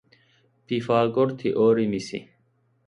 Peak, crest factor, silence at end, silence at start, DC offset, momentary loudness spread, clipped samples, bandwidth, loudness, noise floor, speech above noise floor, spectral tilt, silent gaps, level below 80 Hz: -8 dBFS; 18 dB; 0.65 s; 0.7 s; under 0.1%; 12 LU; under 0.1%; 10.5 kHz; -23 LUFS; -66 dBFS; 44 dB; -7 dB/octave; none; -64 dBFS